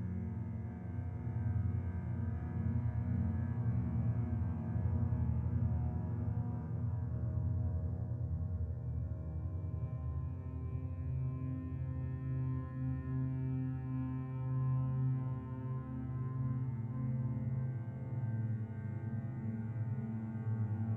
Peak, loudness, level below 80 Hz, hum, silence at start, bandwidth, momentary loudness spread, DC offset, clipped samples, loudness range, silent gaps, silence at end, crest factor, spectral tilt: -22 dBFS; -39 LUFS; -48 dBFS; none; 0 s; 2.8 kHz; 6 LU; under 0.1%; under 0.1%; 4 LU; none; 0 s; 14 dB; -12 dB/octave